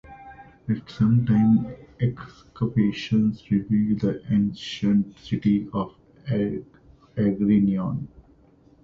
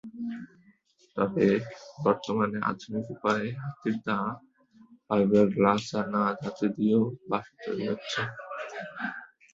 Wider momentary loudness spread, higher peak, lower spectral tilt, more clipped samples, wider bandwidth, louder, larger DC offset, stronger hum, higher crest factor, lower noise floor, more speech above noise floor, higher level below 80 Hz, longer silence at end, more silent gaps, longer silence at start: about the same, 16 LU vs 14 LU; second, -10 dBFS vs -6 dBFS; first, -8.5 dB/octave vs -6.5 dB/octave; neither; second, 6.8 kHz vs 7.8 kHz; first, -24 LUFS vs -29 LUFS; neither; neither; second, 14 dB vs 22 dB; second, -55 dBFS vs -63 dBFS; about the same, 33 dB vs 35 dB; first, -52 dBFS vs -66 dBFS; first, 0.75 s vs 0.25 s; neither; about the same, 0.1 s vs 0.05 s